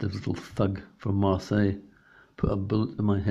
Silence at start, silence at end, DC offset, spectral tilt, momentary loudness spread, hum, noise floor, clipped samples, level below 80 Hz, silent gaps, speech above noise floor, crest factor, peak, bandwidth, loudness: 0 s; 0 s; under 0.1%; -8.5 dB/octave; 8 LU; none; -55 dBFS; under 0.1%; -48 dBFS; none; 29 dB; 18 dB; -10 dBFS; 7.8 kHz; -28 LUFS